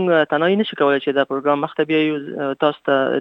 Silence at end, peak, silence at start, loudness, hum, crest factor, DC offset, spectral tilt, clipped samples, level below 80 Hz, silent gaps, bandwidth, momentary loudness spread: 0 s; -2 dBFS; 0 s; -19 LUFS; none; 16 dB; under 0.1%; -8 dB/octave; under 0.1%; -72 dBFS; none; 5.6 kHz; 4 LU